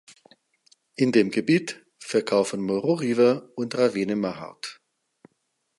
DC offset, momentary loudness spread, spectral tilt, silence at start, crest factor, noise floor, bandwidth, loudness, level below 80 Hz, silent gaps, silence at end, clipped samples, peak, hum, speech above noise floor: under 0.1%; 16 LU; -5.5 dB/octave; 1 s; 20 dB; -75 dBFS; 11.5 kHz; -24 LUFS; -70 dBFS; none; 1.05 s; under 0.1%; -6 dBFS; none; 52 dB